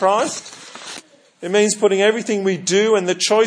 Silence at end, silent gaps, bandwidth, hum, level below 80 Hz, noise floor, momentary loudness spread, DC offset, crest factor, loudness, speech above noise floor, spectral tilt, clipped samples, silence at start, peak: 0 s; none; 10.5 kHz; none; -76 dBFS; -41 dBFS; 18 LU; under 0.1%; 16 dB; -17 LUFS; 24 dB; -3 dB/octave; under 0.1%; 0 s; -2 dBFS